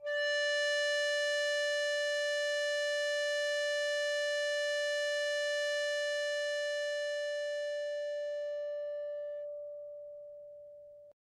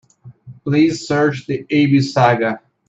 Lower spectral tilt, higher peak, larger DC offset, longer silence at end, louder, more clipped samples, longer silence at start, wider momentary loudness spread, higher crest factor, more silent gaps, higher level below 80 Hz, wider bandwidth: second, 3.5 dB/octave vs -6.5 dB/octave; second, -22 dBFS vs 0 dBFS; neither; about the same, 0.25 s vs 0.3 s; second, -33 LUFS vs -16 LUFS; neither; second, 0 s vs 0.25 s; first, 14 LU vs 8 LU; about the same, 12 dB vs 16 dB; neither; second, -86 dBFS vs -58 dBFS; first, 13.5 kHz vs 8 kHz